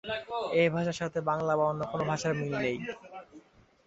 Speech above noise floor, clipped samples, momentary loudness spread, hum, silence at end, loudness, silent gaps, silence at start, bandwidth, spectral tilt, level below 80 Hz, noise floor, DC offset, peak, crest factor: 28 dB; under 0.1%; 13 LU; none; 0.45 s; -30 LUFS; none; 0.05 s; 8 kHz; -5.5 dB/octave; -64 dBFS; -57 dBFS; under 0.1%; -12 dBFS; 18 dB